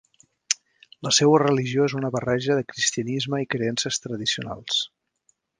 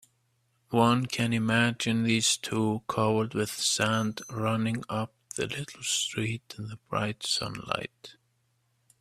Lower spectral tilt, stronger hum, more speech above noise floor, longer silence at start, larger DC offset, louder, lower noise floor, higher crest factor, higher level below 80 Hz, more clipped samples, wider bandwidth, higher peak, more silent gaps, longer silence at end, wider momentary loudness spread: about the same, -3.5 dB/octave vs -4 dB/octave; neither; about the same, 45 dB vs 44 dB; second, 0.5 s vs 0.7 s; neither; first, -23 LUFS vs -28 LUFS; second, -68 dBFS vs -72 dBFS; about the same, 24 dB vs 20 dB; about the same, -62 dBFS vs -64 dBFS; neither; second, 10.5 kHz vs 15 kHz; first, -2 dBFS vs -8 dBFS; neither; second, 0.7 s vs 0.9 s; about the same, 9 LU vs 10 LU